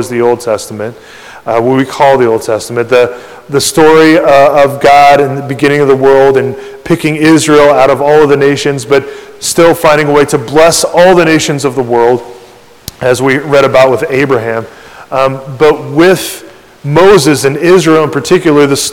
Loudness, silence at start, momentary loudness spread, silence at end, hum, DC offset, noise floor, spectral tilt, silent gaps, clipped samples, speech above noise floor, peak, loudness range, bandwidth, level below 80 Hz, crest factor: -7 LUFS; 0 s; 11 LU; 0 s; none; 0.7%; -36 dBFS; -4.5 dB/octave; none; 9%; 29 dB; 0 dBFS; 4 LU; 18 kHz; -40 dBFS; 8 dB